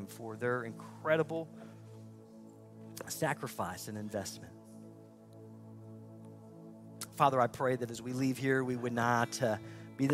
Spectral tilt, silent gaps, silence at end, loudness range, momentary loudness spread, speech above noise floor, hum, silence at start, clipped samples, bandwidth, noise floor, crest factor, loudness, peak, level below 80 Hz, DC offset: -5.5 dB/octave; none; 0 s; 12 LU; 22 LU; 20 dB; none; 0 s; under 0.1%; 16 kHz; -55 dBFS; 22 dB; -35 LUFS; -14 dBFS; -74 dBFS; under 0.1%